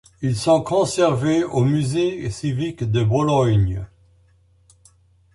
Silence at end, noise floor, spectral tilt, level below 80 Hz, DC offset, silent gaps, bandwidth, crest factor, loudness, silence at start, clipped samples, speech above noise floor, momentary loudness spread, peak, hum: 1.5 s; -56 dBFS; -6.5 dB/octave; -42 dBFS; under 0.1%; none; 11.5 kHz; 16 dB; -20 LUFS; 0.2 s; under 0.1%; 38 dB; 8 LU; -4 dBFS; none